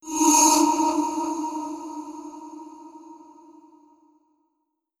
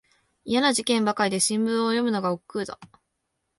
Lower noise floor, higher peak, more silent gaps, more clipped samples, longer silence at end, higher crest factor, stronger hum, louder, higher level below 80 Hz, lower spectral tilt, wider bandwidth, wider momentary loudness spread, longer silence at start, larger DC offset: about the same, -77 dBFS vs -78 dBFS; about the same, -6 dBFS vs -6 dBFS; neither; neither; first, 1.85 s vs 0.75 s; about the same, 20 dB vs 20 dB; neither; first, -20 LUFS vs -24 LUFS; about the same, -66 dBFS vs -66 dBFS; second, -0.5 dB/octave vs -3.5 dB/octave; first, 18.5 kHz vs 11.5 kHz; first, 25 LU vs 12 LU; second, 0.05 s vs 0.45 s; neither